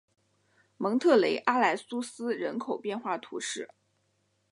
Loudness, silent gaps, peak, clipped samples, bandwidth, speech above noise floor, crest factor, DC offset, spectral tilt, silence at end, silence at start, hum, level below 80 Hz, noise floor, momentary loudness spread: -29 LUFS; none; -8 dBFS; under 0.1%; 11.5 kHz; 45 dB; 22 dB; under 0.1%; -4 dB/octave; 0.85 s; 0.8 s; none; -84 dBFS; -74 dBFS; 12 LU